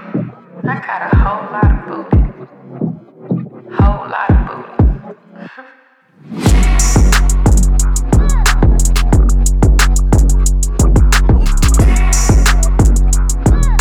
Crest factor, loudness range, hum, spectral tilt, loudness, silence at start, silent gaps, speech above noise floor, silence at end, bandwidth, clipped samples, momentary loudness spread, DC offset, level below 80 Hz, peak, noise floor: 10 dB; 6 LU; none; -5 dB/octave; -13 LUFS; 0 s; none; 34 dB; 0 s; 15 kHz; under 0.1%; 11 LU; under 0.1%; -12 dBFS; 0 dBFS; -48 dBFS